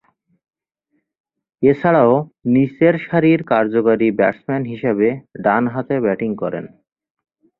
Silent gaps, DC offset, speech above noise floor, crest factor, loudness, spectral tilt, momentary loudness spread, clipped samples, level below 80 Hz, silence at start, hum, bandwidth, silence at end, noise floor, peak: none; under 0.1%; 54 dB; 16 dB; -17 LUFS; -10.5 dB/octave; 8 LU; under 0.1%; -58 dBFS; 1.6 s; none; 4.2 kHz; 0.9 s; -70 dBFS; -2 dBFS